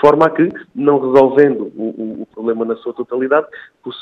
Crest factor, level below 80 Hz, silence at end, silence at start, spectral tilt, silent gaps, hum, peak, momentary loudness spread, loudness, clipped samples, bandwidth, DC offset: 14 dB; -56 dBFS; 0 s; 0 s; -8 dB/octave; none; none; 0 dBFS; 15 LU; -15 LUFS; 0.1%; 6 kHz; under 0.1%